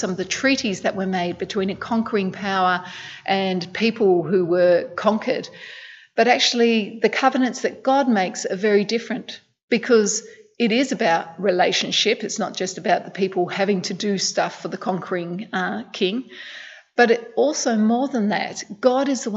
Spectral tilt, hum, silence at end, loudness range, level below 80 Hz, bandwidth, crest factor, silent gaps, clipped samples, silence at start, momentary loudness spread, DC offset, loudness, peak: -4 dB/octave; none; 0 s; 4 LU; -66 dBFS; 8.2 kHz; 18 dB; 9.63-9.68 s; under 0.1%; 0 s; 10 LU; under 0.1%; -21 LUFS; -2 dBFS